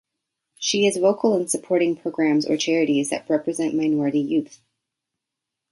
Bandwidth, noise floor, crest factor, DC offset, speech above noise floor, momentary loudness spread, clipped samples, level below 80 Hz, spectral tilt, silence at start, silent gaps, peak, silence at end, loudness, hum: 11.5 kHz; -84 dBFS; 16 dB; under 0.1%; 63 dB; 5 LU; under 0.1%; -70 dBFS; -4 dB/octave; 0.6 s; none; -6 dBFS; 1.15 s; -21 LUFS; none